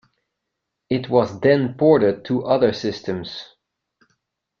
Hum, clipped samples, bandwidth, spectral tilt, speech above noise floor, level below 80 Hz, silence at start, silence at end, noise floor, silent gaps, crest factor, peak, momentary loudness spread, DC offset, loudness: none; under 0.1%; 7.2 kHz; -7.5 dB/octave; 61 dB; -58 dBFS; 0.9 s; 1.15 s; -80 dBFS; none; 20 dB; -2 dBFS; 12 LU; under 0.1%; -19 LUFS